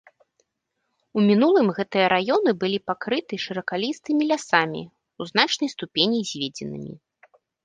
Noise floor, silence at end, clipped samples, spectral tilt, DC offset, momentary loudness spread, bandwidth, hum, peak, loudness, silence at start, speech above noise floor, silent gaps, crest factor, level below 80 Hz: -78 dBFS; 0.7 s; under 0.1%; -4.5 dB/octave; under 0.1%; 12 LU; 9.6 kHz; none; -2 dBFS; -22 LUFS; 1.15 s; 55 dB; none; 22 dB; -68 dBFS